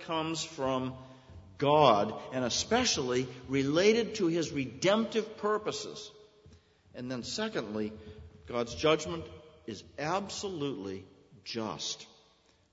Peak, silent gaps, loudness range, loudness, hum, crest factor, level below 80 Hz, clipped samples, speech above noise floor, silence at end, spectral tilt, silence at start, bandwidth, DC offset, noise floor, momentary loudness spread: -10 dBFS; none; 10 LU; -31 LUFS; none; 22 dB; -62 dBFS; under 0.1%; 35 dB; 0.65 s; -4 dB/octave; 0 s; 8 kHz; under 0.1%; -66 dBFS; 20 LU